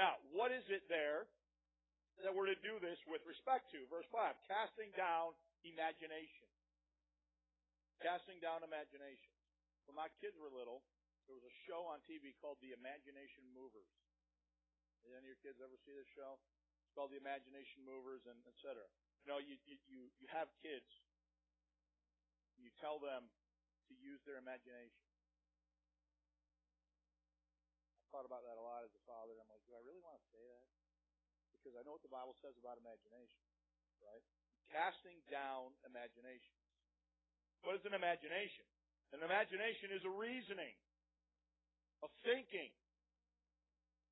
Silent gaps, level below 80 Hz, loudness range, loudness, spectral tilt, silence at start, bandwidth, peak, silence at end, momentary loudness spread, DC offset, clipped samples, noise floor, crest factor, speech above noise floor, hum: none; under -90 dBFS; 16 LU; -48 LUFS; 2.5 dB/octave; 0 s; 3.9 kHz; -22 dBFS; 1.4 s; 21 LU; under 0.1%; under 0.1%; under -90 dBFS; 28 dB; over 41 dB; none